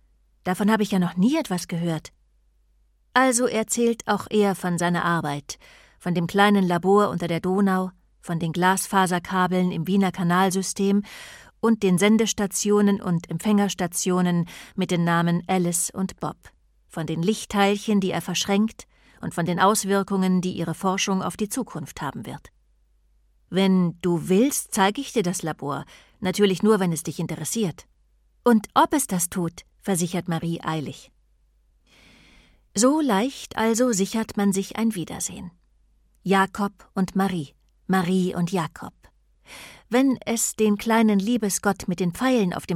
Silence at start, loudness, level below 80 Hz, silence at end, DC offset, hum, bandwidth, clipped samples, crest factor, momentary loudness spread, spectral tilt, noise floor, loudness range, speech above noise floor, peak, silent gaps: 0.45 s; -23 LUFS; -56 dBFS; 0 s; under 0.1%; none; 16 kHz; under 0.1%; 20 dB; 12 LU; -5 dB/octave; -63 dBFS; 4 LU; 40 dB; -4 dBFS; none